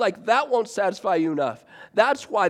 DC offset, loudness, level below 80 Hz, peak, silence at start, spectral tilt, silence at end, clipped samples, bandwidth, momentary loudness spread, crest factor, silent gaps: under 0.1%; -23 LUFS; -74 dBFS; -4 dBFS; 0 s; -4.5 dB/octave; 0 s; under 0.1%; 13 kHz; 7 LU; 20 dB; none